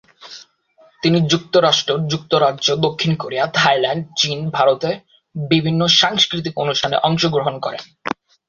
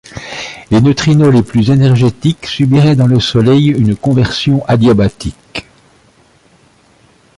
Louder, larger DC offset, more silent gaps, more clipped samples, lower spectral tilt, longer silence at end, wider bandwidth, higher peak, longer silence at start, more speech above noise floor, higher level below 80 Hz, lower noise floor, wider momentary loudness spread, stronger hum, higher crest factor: second, -17 LUFS vs -10 LUFS; neither; neither; neither; second, -4.5 dB/octave vs -7 dB/octave; second, 0.35 s vs 1.75 s; second, 7.4 kHz vs 11.5 kHz; about the same, -2 dBFS vs 0 dBFS; about the same, 0.2 s vs 0.15 s; about the same, 36 dB vs 39 dB; second, -56 dBFS vs -36 dBFS; first, -53 dBFS vs -48 dBFS; about the same, 14 LU vs 15 LU; neither; first, 16 dB vs 10 dB